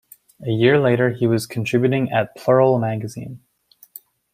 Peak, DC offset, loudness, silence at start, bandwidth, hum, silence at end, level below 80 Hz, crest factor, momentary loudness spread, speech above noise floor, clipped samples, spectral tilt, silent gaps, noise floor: -2 dBFS; under 0.1%; -18 LUFS; 0.4 s; 16 kHz; none; 0.95 s; -60 dBFS; 18 dB; 16 LU; 28 dB; under 0.1%; -7 dB/octave; none; -46 dBFS